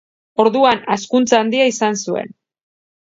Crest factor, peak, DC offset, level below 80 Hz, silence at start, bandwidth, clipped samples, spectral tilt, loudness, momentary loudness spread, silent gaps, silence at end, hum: 18 dB; 0 dBFS; under 0.1%; -64 dBFS; 0.4 s; 7.8 kHz; under 0.1%; -3.5 dB/octave; -16 LUFS; 11 LU; none; 0.8 s; none